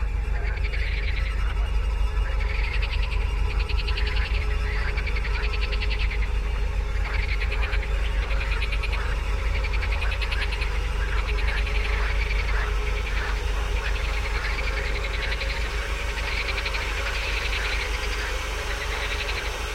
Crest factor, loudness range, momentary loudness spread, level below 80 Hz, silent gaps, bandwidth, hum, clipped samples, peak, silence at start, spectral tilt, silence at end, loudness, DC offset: 12 dB; 1 LU; 2 LU; -26 dBFS; none; 13 kHz; none; under 0.1%; -12 dBFS; 0 s; -4 dB/octave; 0 s; -27 LUFS; under 0.1%